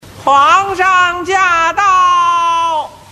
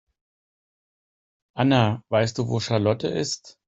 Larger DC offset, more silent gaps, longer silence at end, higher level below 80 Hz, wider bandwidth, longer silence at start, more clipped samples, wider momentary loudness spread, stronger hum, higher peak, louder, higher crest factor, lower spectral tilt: neither; neither; about the same, 0.15 s vs 0.15 s; first, -46 dBFS vs -58 dBFS; first, 12.5 kHz vs 8.2 kHz; second, 0.15 s vs 1.55 s; neither; second, 5 LU vs 8 LU; neither; first, 0 dBFS vs -4 dBFS; first, -10 LUFS vs -23 LUFS; second, 12 dB vs 22 dB; second, -2 dB/octave vs -5.5 dB/octave